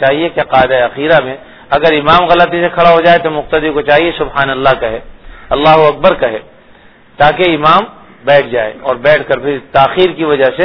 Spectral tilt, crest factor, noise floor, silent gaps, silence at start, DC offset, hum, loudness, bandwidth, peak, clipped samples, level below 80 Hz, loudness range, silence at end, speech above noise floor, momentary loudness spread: -7 dB/octave; 10 dB; -41 dBFS; none; 0 s; 0.4%; none; -10 LUFS; 5.4 kHz; 0 dBFS; 1%; -36 dBFS; 2 LU; 0 s; 32 dB; 9 LU